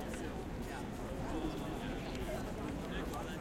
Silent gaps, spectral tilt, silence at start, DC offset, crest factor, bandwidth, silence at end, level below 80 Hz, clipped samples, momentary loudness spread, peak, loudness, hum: none; -5.5 dB/octave; 0 s; under 0.1%; 16 dB; 16.5 kHz; 0 s; -48 dBFS; under 0.1%; 3 LU; -26 dBFS; -42 LUFS; none